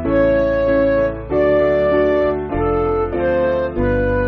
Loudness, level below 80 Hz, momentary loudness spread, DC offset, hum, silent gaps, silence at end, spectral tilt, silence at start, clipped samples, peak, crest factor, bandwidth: -17 LUFS; -30 dBFS; 4 LU; under 0.1%; none; none; 0 s; -6.5 dB/octave; 0 s; under 0.1%; -4 dBFS; 12 dB; 5.8 kHz